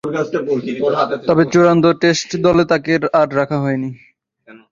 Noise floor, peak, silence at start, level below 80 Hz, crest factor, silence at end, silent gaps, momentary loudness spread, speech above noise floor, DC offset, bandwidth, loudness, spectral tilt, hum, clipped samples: -45 dBFS; -2 dBFS; 0.05 s; -50 dBFS; 14 dB; 0.15 s; none; 8 LU; 30 dB; under 0.1%; 7.6 kHz; -15 LUFS; -6 dB/octave; none; under 0.1%